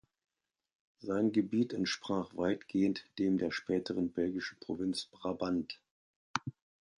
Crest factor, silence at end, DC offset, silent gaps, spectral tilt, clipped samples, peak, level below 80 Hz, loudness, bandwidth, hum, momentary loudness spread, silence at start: 24 dB; 0.45 s; under 0.1%; 5.91-6.34 s; -5.5 dB/octave; under 0.1%; -12 dBFS; -68 dBFS; -35 LUFS; 11 kHz; none; 9 LU; 1 s